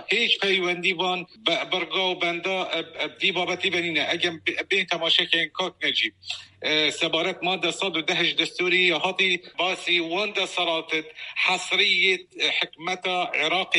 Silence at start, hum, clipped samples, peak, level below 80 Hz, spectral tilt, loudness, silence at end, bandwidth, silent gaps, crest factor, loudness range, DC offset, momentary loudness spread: 0 s; none; under 0.1%; -4 dBFS; -74 dBFS; -2.5 dB/octave; -23 LUFS; 0 s; 11 kHz; none; 22 dB; 2 LU; under 0.1%; 7 LU